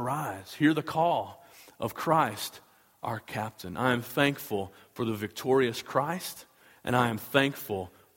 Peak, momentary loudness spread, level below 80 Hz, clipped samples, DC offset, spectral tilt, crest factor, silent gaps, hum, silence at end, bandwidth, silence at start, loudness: -6 dBFS; 11 LU; -66 dBFS; under 0.1%; under 0.1%; -5 dB/octave; 24 dB; none; none; 0.3 s; 17 kHz; 0 s; -29 LUFS